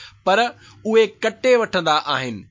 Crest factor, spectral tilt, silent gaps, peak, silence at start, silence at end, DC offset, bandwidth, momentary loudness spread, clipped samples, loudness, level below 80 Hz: 16 dB; -4 dB/octave; none; -4 dBFS; 0 s; 0.1 s; under 0.1%; 7.6 kHz; 7 LU; under 0.1%; -19 LUFS; -60 dBFS